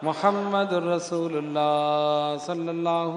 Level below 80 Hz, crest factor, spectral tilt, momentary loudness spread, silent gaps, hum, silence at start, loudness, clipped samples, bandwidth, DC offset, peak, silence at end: -78 dBFS; 18 dB; -5.5 dB/octave; 5 LU; none; none; 0 s; -25 LUFS; under 0.1%; 10.5 kHz; under 0.1%; -6 dBFS; 0 s